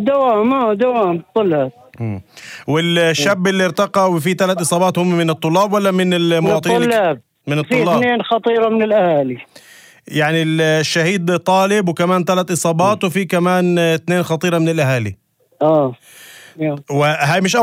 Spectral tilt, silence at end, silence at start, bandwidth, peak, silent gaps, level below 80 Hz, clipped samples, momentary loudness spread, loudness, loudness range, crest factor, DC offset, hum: -5 dB/octave; 0 s; 0 s; 16.5 kHz; -2 dBFS; none; -62 dBFS; under 0.1%; 8 LU; -15 LUFS; 2 LU; 14 dB; under 0.1%; none